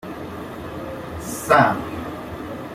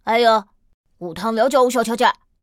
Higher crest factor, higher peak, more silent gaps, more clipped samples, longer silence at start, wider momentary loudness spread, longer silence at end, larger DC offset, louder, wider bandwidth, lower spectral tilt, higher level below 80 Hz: first, 22 dB vs 16 dB; about the same, -2 dBFS vs -2 dBFS; second, none vs 0.74-0.84 s; neither; about the same, 0.05 s vs 0.05 s; first, 17 LU vs 12 LU; second, 0 s vs 0.3 s; neither; second, -23 LUFS vs -18 LUFS; about the same, 16.5 kHz vs 16.5 kHz; first, -5 dB/octave vs -3.5 dB/octave; first, -48 dBFS vs -58 dBFS